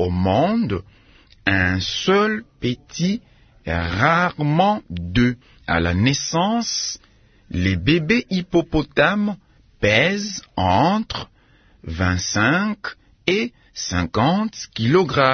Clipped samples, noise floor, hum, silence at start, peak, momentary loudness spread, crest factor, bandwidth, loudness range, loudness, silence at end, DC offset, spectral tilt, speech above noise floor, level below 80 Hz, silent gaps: under 0.1%; -54 dBFS; none; 0 s; 0 dBFS; 12 LU; 20 dB; 6.6 kHz; 2 LU; -20 LUFS; 0 s; under 0.1%; -5 dB/octave; 34 dB; -44 dBFS; none